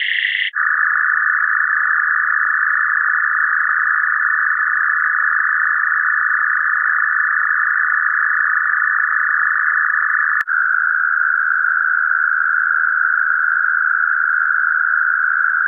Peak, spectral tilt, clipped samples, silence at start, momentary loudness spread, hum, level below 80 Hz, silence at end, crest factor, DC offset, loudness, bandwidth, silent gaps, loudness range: -4 dBFS; 3.5 dB/octave; under 0.1%; 0 s; 0 LU; none; -88 dBFS; 0 s; 12 dB; under 0.1%; -15 LUFS; 4.3 kHz; none; 0 LU